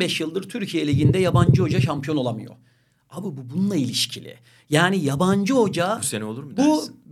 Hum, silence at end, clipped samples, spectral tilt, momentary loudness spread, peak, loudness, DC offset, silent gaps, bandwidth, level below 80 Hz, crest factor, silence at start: none; 0 s; under 0.1%; -5.5 dB/octave; 12 LU; -2 dBFS; -21 LUFS; under 0.1%; none; 14.5 kHz; -50 dBFS; 20 dB; 0 s